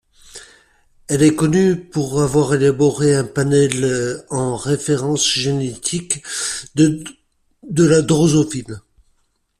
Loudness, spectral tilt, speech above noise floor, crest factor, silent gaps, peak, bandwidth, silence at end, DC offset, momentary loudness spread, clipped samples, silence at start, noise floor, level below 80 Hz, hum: -17 LUFS; -5 dB/octave; 47 dB; 16 dB; none; -2 dBFS; 14 kHz; 0.8 s; under 0.1%; 9 LU; under 0.1%; 0.35 s; -64 dBFS; -48 dBFS; none